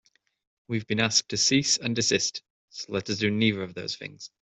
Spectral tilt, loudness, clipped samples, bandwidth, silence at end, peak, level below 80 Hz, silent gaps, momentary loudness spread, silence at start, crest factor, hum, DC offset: -3 dB/octave; -25 LUFS; under 0.1%; 8.4 kHz; 0.15 s; -8 dBFS; -64 dBFS; 2.50-2.68 s; 16 LU; 0.7 s; 20 dB; none; under 0.1%